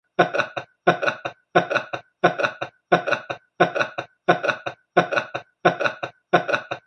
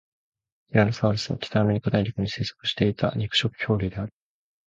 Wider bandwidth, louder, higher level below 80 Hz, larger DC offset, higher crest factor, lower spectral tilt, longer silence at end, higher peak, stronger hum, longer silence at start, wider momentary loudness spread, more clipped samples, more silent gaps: first, 9 kHz vs 7.8 kHz; about the same, -23 LUFS vs -25 LUFS; second, -68 dBFS vs -48 dBFS; neither; about the same, 22 dB vs 20 dB; about the same, -5.5 dB/octave vs -6 dB/octave; second, 0.05 s vs 0.6 s; first, 0 dBFS vs -6 dBFS; neither; second, 0.2 s vs 0.7 s; first, 9 LU vs 6 LU; neither; neither